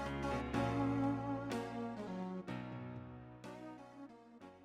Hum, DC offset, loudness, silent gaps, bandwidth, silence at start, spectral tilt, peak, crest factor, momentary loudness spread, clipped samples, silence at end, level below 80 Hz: none; under 0.1%; -41 LUFS; none; 13 kHz; 0 s; -7 dB/octave; -22 dBFS; 20 dB; 18 LU; under 0.1%; 0 s; -58 dBFS